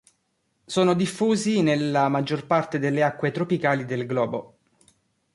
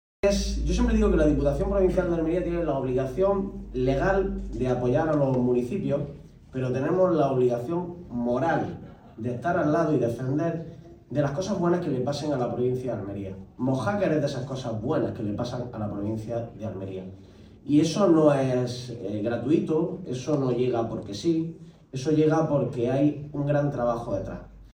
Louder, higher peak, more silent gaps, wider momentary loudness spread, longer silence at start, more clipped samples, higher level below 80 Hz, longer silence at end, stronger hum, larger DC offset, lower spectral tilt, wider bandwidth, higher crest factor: first, -23 LUFS vs -26 LUFS; about the same, -8 dBFS vs -8 dBFS; neither; second, 5 LU vs 12 LU; first, 0.7 s vs 0.25 s; neither; second, -66 dBFS vs -40 dBFS; first, 0.9 s vs 0.05 s; neither; neither; about the same, -6 dB/octave vs -7 dB/octave; second, 11.5 kHz vs 16 kHz; about the same, 16 dB vs 18 dB